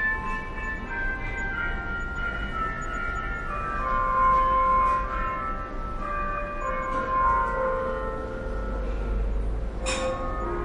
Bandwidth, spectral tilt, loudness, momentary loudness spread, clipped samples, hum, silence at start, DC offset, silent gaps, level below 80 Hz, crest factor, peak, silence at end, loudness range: 11 kHz; -5 dB/octave; -27 LUFS; 11 LU; under 0.1%; none; 0 s; under 0.1%; none; -32 dBFS; 16 dB; -12 dBFS; 0 s; 5 LU